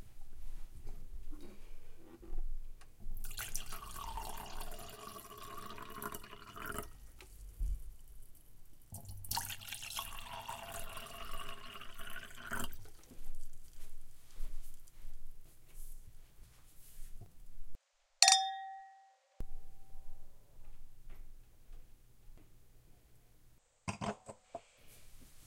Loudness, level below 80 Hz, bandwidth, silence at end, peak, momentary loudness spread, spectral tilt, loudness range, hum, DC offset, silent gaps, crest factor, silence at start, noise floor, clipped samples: -39 LUFS; -46 dBFS; 17 kHz; 0 s; -6 dBFS; 19 LU; -1 dB/octave; 23 LU; none; under 0.1%; none; 34 dB; 0 s; -65 dBFS; under 0.1%